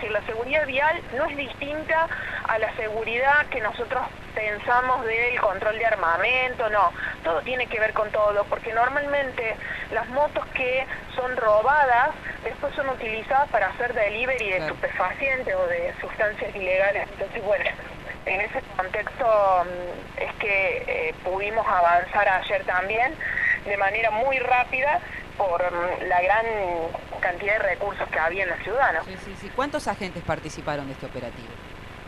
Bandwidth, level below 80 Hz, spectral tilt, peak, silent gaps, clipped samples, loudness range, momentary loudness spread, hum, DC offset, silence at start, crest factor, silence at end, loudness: 13 kHz; -46 dBFS; -5 dB/octave; -8 dBFS; none; under 0.1%; 3 LU; 10 LU; 50 Hz at -50 dBFS; under 0.1%; 0 s; 16 dB; 0 s; -24 LUFS